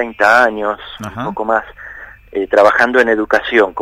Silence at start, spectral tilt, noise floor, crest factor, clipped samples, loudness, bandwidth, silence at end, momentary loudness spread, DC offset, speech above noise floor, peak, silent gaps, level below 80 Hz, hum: 0 s; -4.5 dB/octave; -34 dBFS; 14 dB; 0.1%; -13 LUFS; 15.5 kHz; 0 s; 20 LU; under 0.1%; 21 dB; 0 dBFS; none; -46 dBFS; none